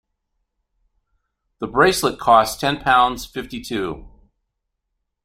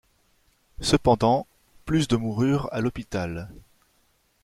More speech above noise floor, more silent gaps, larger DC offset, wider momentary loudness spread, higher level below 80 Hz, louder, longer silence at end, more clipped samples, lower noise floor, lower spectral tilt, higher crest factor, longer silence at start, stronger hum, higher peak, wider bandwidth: first, 58 dB vs 43 dB; neither; neither; about the same, 15 LU vs 17 LU; about the same, -46 dBFS vs -46 dBFS; first, -18 LUFS vs -24 LUFS; first, 1.15 s vs 0.85 s; neither; first, -77 dBFS vs -66 dBFS; second, -3.5 dB/octave vs -6 dB/octave; about the same, 20 dB vs 22 dB; first, 1.6 s vs 0.8 s; neither; about the same, -2 dBFS vs -4 dBFS; about the same, 16 kHz vs 15.5 kHz